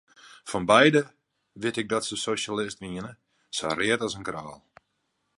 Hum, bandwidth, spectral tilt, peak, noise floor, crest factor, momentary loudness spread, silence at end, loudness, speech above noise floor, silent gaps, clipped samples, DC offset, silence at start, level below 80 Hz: none; 11.5 kHz; -4 dB/octave; -4 dBFS; -76 dBFS; 24 dB; 20 LU; 0.85 s; -26 LUFS; 50 dB; none; under 0.1%; under 0.1%; 0.25 s; -62 dBFS